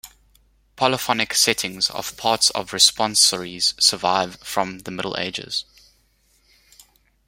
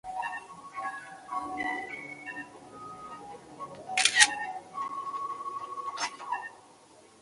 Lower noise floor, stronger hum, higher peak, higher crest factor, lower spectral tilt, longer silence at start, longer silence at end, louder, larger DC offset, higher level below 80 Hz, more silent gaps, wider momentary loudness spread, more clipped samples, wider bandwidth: first, -62 dBFS vs -57 dBFS; neither; about the same, 0 dBFS vs -2 dBFS; second, 22 dB vs 32 dB; first, -1 dB/octave vs 0.5 dB/octave; about the same, 0.05 s vs 0.05 s; first, 1.65 s vs 0 s; first, -19 LUFS vs -30 LUFS; neither; first, -58 dBFS vs -72 dBFS; neither; second, 11 LU vs 21 LU; neither; first, 16.5 kHz vs 11.5 kHz